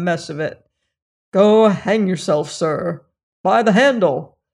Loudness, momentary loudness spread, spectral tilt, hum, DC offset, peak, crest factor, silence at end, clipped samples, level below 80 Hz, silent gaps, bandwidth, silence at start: -17 LUFS; 14 LU; -6 dB/octave; none; under 0.1%; -2 dBFS; 14 dB; 0.3 s; under 0.1%; -62 dBFS; 1.02-1.32 s, 3.23-3.44 s; 11 kHz; 0 s